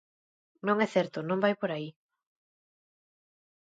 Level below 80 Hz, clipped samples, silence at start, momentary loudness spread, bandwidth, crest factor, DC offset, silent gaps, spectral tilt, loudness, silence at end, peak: -82 dBFS; under 0.1%; 0.65 s; 10 LU; 8 kHz; 22 dB; under 0.1%; none; -6.5 dB/octave; -30 LUFS; 1.85 s; -12 dBFS